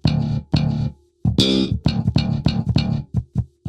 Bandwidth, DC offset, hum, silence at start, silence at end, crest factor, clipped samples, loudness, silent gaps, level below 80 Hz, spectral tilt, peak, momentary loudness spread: 11 kHz; under 0.1%; none; 0.05 s; 0 s; 16 dB; under 0.1%; -21 LUFS; none; -32 dBFS; -6.5 dB/octave; -4 dBFS; 8 LU